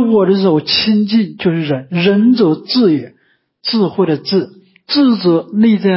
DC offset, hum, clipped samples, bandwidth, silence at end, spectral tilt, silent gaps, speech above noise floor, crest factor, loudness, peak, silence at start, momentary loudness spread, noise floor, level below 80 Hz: under 0.1%; none; under 0.1%; 5.8 kHz; 0 s; -10 dB/octave; none; 45 dB; 12 dB; -13 LUFS; -2 dBFS; 0 s; 7 LU; -57 dBFS; -56 dBFS